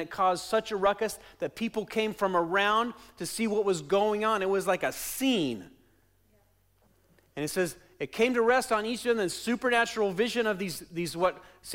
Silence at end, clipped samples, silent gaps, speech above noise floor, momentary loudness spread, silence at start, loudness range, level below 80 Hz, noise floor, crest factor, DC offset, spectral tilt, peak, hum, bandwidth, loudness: 0 s; under 0.1%; none; 38 dB; 10 LU; 0 s; 5 LU; -62 dBFS; -67 dBFS; 14 dB; under 0.1%; -4 dB/octave; -14 dBFS; none; 16.5 kHz; -29 LUFS